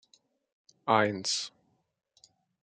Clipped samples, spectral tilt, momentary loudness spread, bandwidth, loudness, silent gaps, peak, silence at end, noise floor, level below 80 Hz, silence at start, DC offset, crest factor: under 0.1%; -3 dB/octave; 14 LU; 9.6 kHz; -29 LUFS; none; -8 dBFS; 1.15 s; -65 dBFS; -82 dBFS; 0.85 s; under 0.1%; 26 dB